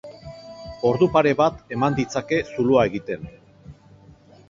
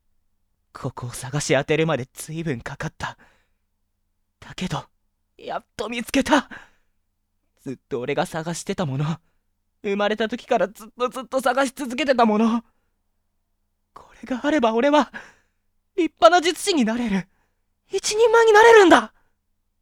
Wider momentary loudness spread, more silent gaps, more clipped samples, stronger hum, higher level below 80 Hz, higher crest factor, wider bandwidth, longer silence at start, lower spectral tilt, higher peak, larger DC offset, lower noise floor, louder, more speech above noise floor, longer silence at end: first, 22 LU vs 17 LU; neither; neither; neither; about the same, -50 dBFS vs -54 dBFS; about the same, 20 dB vs 22 dB; second, 7.6 kHz vs 16.5 kHz; second, 0.05 s vs 0.75 s; first, -6.5 dB/octave vs -4.5 dB/octave; about the same, -2 dBFS vs 0 dBFS; neither; second, -50 dBFS vs -72 dBFS; about the same, -21 LUFS vs -20 LUFS; second, 29 dB vs 51 dB; about the same, 0.75 s vs 0.75 s